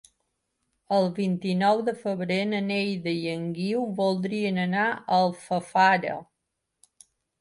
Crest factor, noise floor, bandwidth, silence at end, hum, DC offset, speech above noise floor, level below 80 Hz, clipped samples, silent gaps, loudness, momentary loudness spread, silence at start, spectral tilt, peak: 18 dB; -81 dBFS; 11.5 kHz; 1.2 s; none; under 0.1%; 56 dB; -70 dBFS; under 0.1%; none; -26 LUFS; 8 LU; 0.9 s; -6.5 dB/octave; -8 dBFS